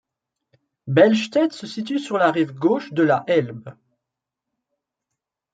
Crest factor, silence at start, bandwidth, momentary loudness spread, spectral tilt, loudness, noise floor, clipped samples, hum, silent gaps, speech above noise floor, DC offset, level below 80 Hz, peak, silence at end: 20 dB; 0.85 s; 9 kHz; 15 LU; -6.5 dB/octave; -20 LUFS; -84 dBFS; under 0.1%; none; none; 65 dB; under 0.1%; -70 dBFS; -2 dBFS; 1.8 s